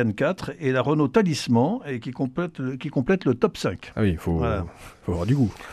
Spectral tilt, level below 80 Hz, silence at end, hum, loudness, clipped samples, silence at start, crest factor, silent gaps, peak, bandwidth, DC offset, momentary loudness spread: -7 dB/octave; -44 dBFS; 0 s; none; -24 LUFS; under 0.1%; 0 s; 18 dB; none; -6 dBFS; 14 kHz; under 0.1%; 9 LU